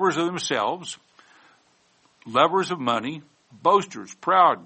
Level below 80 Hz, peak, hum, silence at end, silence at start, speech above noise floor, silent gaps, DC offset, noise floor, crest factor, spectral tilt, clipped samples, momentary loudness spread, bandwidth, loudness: -72 dBFS; -4 dBFS; none; 0 s; 0 s; 40 dB; none; under 0.1%; -62 dBFS; 20 dB; -4 dB/octave; under 0.1%; 16 LU; 8.8 kHz; -23 LUFS